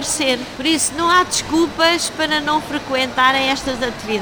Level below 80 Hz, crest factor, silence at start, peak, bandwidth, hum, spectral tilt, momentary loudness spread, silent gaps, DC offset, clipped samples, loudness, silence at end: -44 dBFS; 18 dB; 0 s; 0 dBFS; over 20 kHz; none; -2 dB/octave; 6 LU; none; 0.1%; under 0.1%; -17 LUFS; 0 s